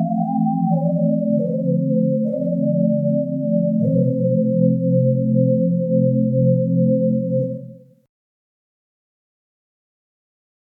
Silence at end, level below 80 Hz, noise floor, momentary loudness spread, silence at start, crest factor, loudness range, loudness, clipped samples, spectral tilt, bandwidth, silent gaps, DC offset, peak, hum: 2.95 s; -80 dBFS; -38 dBFS; 4 LU; 0 s; 14 dB; 6 LU; -19 LUFS; under 0.1%; -15 dB/octave; 0.9 kHz; none; under 0.1%; -4 dBFS; none